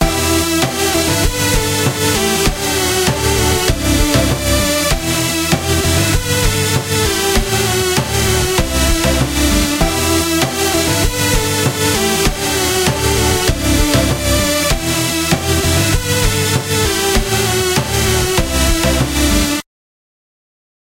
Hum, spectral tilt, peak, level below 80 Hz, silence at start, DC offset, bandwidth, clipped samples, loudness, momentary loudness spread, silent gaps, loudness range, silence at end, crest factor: none; -3.5 dB/octave; 0 dBFS; -22 dBFS; 0 s; under 0.1%; 16 kHz; under 0.1%; -14 LUFS; 2 LU; none; 0 LU; 1.25 s; 14 dB